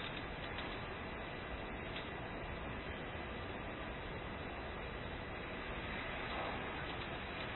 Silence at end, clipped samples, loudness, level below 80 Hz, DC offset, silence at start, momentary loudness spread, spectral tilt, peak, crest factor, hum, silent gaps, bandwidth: 0 s; under 0.1%; -44 LUFS; -54 dBFS; under 0.1%; 0 s; 3 LU; -3.5 dB/octave; -30 dBFS; 14 dB; none; none; 4.2 kHz